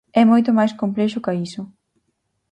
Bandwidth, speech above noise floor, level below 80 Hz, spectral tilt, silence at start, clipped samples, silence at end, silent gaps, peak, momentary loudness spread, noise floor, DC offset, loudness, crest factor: 9 kHz; 54 dB; -64 dBFS; -7 dB/octave; 0.15 s; under 0.1%; 0.85 s; none; -2 dBFS; 18 LU; -72 dBFS; under 0.1%; -18 LUFS; 18 dB